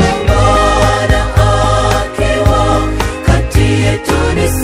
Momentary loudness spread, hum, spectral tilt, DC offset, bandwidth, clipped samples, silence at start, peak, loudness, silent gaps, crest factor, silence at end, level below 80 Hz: 4 LU; none; -5.5 dB/octave; under 0.1%; 16 kHz; 0.3%; 0 s; 0 dBFS; -12 LUFS; none; 10 dB; 0 s; -16 dBFS